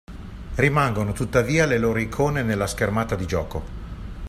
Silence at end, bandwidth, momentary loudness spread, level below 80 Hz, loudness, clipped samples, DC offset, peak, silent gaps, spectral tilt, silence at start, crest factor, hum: 0 s; 15 kHz; 17 LU; -36 dBFS; -22 LUFS; under 0.1%; under 0.1%; -4 dBFS; none; -6 dB/octave; 0.1 s; 20 dB; none